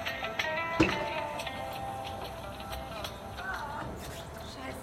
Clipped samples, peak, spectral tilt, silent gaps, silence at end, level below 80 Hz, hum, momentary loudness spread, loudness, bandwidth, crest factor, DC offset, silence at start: under 0.1%; -10 dBFS; -4.5 dB/octave; none; 0 s; -50 dBFS; none; 13 LU; -35 LUFS; 16 kHz; 24 dB; under 0.1%; 0 s